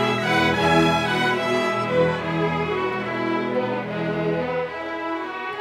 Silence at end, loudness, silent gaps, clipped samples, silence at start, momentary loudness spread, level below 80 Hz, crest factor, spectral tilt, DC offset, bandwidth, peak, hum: 0 s; -22 LUFS; none; under 0.1%; 0 s; 9 LU; -50 dBFS; 16 dB; -5.5 dB/octave; under 0.1%; 15 kHz; -6 dBFS; none